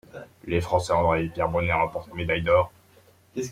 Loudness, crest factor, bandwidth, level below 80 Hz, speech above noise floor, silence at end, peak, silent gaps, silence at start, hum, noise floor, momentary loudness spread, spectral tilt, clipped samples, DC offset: -25 LUFS; 18 dB; 15 kHz; -48 dBFS; 33 dB; 0 s; -8 dBFS; none; 0.15 s; none; -57 dBFS; 13 LU; -6 dB/octave; under 0.1%; under 0.1%